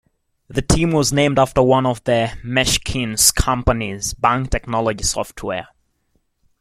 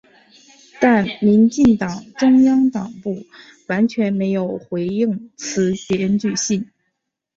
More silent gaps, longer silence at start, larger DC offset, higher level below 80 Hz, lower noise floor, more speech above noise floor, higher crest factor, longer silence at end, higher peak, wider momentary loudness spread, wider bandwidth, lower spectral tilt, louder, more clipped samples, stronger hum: neither; second, 0.5 s vs 0.8 s; neither; first, -32 dBFS vs -54 dBFS; second, -66 dBFS vs -75 dBFS; second, 48 dB vs 58 dB; about the same, 18 dB vs 16 dB; first, 0.95 s vs 0.75 s; about the same, 0 dBFS vs -2 dBFS; about the same, 11 LU vs 13 LU; first, 16.5 kHz vs 7.8 kHz; second, -4 dB/octave vs -5.5 dB/octave; about the same, -18 LUFS vs -18 LUFS; neither; neither